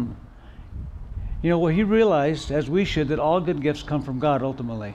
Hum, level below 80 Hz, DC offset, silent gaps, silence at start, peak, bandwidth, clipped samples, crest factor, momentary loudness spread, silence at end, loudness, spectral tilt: none; -38 dBFS; under 0.1%; none; 0 s; -8 dBFS; 9.8 kHz; under 0.1%; 14 dB; 18 LU; 0 s; -23 LUFS; -7.5 dB/octave